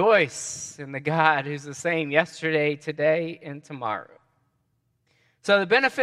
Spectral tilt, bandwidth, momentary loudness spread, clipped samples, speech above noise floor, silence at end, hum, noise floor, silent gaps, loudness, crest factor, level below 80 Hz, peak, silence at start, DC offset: -4 dB/octave; 12.5 kHz; 14 LU; under 0.1%; 48 dB; 0 s; none; -72 dBFS; none; -24 LUFS; 22 dB; -72 dBFS; -2 dBFS; 0 s; under 0.1%